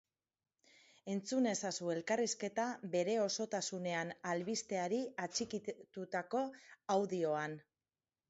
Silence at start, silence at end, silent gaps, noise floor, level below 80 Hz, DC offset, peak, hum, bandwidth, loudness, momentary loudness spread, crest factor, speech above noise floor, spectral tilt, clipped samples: 1.05 s; 0.7 s; none; under -90 dBFS; -84 dBFS; under 0.1%; -22 dBFS; none; 8 kHz; -39 LUFS; 9 LU; 18 dB; over 51 dB; -4 dB/octave; under 0.1%